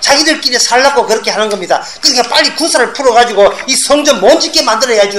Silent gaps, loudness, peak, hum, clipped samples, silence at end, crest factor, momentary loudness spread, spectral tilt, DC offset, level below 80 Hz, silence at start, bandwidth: none; -9 LUFS; 0 dBFS; none; 0.7%; 0 s; 10 dB; 5 LU; -1 dB/octave; 0.8%; -44 dBFS; 0 s; 17.5 kHz